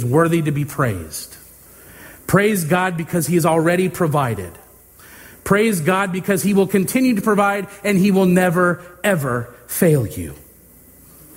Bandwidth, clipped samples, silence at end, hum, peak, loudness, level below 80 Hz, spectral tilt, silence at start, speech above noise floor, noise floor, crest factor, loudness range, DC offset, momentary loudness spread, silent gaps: 16.5 kHz; under 0.1%; 1 s; none; 0 dBFS; -18 LUFS; -48 dBFS; -6 dB/octave; 0 s; 29 dB; -46 dBFS; 18 dB; 3 LU; under 0.1%; 12 LU; none